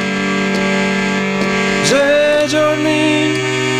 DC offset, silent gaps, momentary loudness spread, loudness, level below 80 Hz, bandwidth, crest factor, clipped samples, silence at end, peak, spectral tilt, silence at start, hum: under 0.1%; none; 4 LU; -14 LUFS; -46 dBFS; 15.5 kHz; 12 dB; under 0.1%; 0 s; -4 dBFS; -4.5 dB/octave; 0 s; none